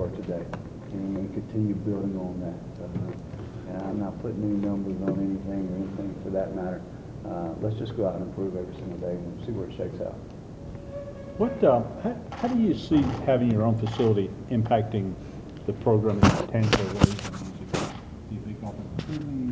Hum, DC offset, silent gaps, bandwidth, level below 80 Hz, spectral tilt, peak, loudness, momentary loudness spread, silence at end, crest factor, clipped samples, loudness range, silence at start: none; under 0.1%; none; 8 kHz; -44 dBFS; -7.5 dB/octave; 0 dBFS; -28 LUFS; 15 LU; 0 s; 26 dB; under 0.1%; 7 LU; 0 s